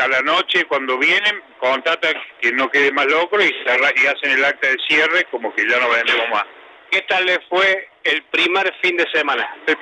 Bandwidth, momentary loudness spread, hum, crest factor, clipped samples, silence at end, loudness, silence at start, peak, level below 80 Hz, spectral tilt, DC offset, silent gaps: 12 kHz; 6 LU; none; 14 dB; under 0.1%; 0 s; -16 LUFS; 0 s; -4 dBFS; -76 dBFS; -2 dB/octave; under 0.1%; none